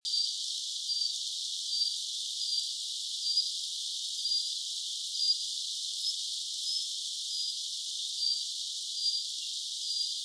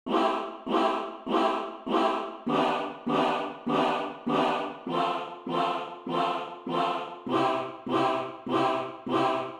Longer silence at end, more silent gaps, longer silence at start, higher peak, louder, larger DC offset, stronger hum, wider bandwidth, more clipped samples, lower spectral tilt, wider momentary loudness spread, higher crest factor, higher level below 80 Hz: about the same, 0 s vs 0 s; neither; about the same, 0.05 s vs 0.05 s; second, -18 dBFS vs -14 dBFS; about the same, -31 LUFS vs -29 LUFS; neither; neither; second, 11 kHz vs 12.5 kHz; neither; second, 11 dB/octave vs -5.5 dB/octave; about the same, 5 LU vs 6 LU; about the same, 16 dB vs 14 dB; second, under -90 dBFS vs -68 dBFS